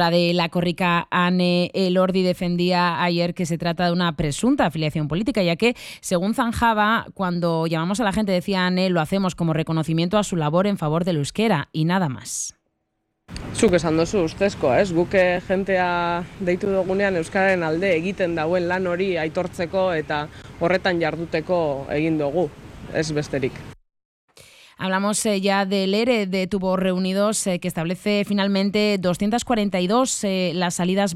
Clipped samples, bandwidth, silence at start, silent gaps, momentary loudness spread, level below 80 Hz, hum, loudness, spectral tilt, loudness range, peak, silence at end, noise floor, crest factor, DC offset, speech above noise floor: under 0.1%; 13.5 kHz; 0 s; 24.05-24.28 s; 6 LU; -48 dBFS; none; -21 LUFS; -5 dB/octave; 3 LU; -6 dBFS; 0 s; -74 dBFS; 16 dB; under 0.1%; 53 dB